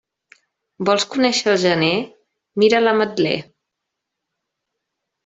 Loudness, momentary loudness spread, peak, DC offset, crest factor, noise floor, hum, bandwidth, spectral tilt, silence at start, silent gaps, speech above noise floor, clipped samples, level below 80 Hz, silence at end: -18 LUFS; 10 LU; -2 dBFS; under 0.1%; 18 dB; -80 dBFS; none; 8 kHz; -4 dB/octave; 0.8 s; none; 63 dB; under 0.1%; -64 dBFS; 1.85 s